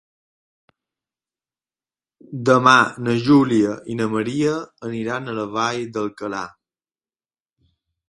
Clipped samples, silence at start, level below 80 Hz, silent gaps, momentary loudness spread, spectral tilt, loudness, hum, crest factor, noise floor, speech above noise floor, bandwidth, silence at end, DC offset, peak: under 0.1%; 2.3 s; -60 dBFS; none; 14 LU; -5.5 dB/octave; -19 LUFS; none; 22 dB; under -90 dBFS; over 71 dB; 11.5 kHz; 1.6 s; under 0.1%; 0 dBFS